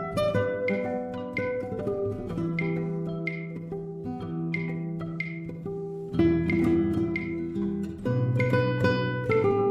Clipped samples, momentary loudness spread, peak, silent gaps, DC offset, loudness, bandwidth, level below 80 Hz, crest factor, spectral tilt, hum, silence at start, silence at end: under 0.1%; 11 LU; -10 dBFS; none; under 0.1%; -28 LUFS; 12 kHz; -50 dBFS; 18 dB; -8.5 dB/octave; none; 0 s; 0 s